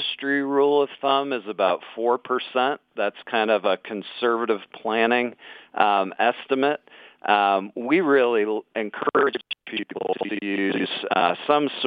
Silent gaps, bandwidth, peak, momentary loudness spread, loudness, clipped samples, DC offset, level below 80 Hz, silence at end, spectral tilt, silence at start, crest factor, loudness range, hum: none; 5 kHz; -2 dBFS; 9 LU; -23 LUFS; under 0.1%; under 0.1%; -76 dBFS; 0 s; -7 dB/octave; 0 s; 22 dB; 2 LU; none